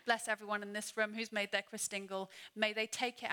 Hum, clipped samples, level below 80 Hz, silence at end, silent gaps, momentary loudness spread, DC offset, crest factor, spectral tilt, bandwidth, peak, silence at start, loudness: none; under 0.1%; -90 dBFS; 0 s; none; 6 LU; under 0.1%; 22 dB; -1.5 dB/octave; 19.5 kHz; -16 dBFS; 0.05 s; -38 LUFS